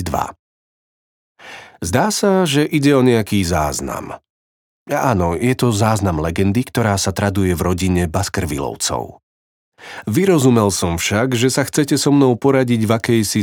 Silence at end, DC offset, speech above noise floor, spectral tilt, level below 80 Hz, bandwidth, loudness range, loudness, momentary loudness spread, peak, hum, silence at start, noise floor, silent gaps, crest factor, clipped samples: 0 s; under 0.1%; over 74 dB; -5 dB/octave; -42 dBFS; 19.5 kHz; 4 LU; -16 LUFS; 13 LU; 0 dBFS; none; 0 s; under -90 dBFS; 0.39-1.35 s, 4.30-4.86 s, 9.23-9.72 s; 16 dB; under 0.1%